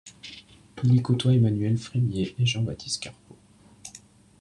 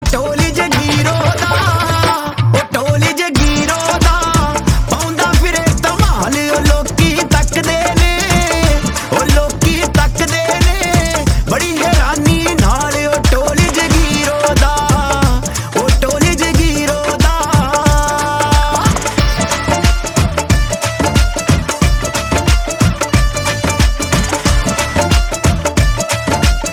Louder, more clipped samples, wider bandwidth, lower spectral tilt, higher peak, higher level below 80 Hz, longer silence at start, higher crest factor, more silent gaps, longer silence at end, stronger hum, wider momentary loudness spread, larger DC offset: second, -25 LUFS vs -13 LUFS; neither; second, 10.5 kHz vs 19 kHz; first, -6 dB/octave vs -4.5 dB/octave; second, -10 dBFS vs 0 dBFS; second, -58 dBFS vs -18 dBFS; about the same, 0.05 s vs 0 s; about the same, 16 dB vs 12 dB; neither; first, 0.45 s vs 0 s; neither; first, 22 LU vs 3 LU; neither